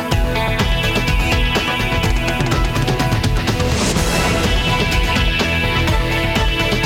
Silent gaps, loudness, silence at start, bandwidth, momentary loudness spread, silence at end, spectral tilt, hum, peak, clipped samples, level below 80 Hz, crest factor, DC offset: none; -17 LUFS; 0 s; 17 kHz; 2 LU; 0 s; -4.5 dB/octave; none; -4 dBFS; under 0.1%; -22 dBFS; 12 dB; under 0.1%